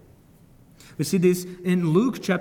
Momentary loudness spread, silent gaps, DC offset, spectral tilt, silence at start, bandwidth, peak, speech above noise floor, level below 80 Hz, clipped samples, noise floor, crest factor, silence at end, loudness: 9 LU; none; under 0.1%; -6.5 dB/octave; 1 s; 18 kHz; -8 dBFS; 31 dB; -60 dBFS; under 0.1%; -53 dBFS; 16 dB; 0 s; -23 LUFS